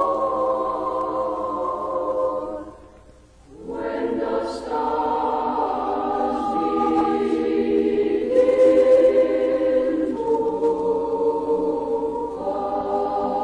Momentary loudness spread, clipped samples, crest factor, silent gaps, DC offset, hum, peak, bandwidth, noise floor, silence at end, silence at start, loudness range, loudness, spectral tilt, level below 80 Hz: 10 LU; under 0.1%; 16 dB; none; under 0.1%; none; -6 dBFS; 10 kHz; -49 dBFS; 0 s; 0 s; 9 LU; -22 LUFS; -6.5 dB/octave; -50 dBFS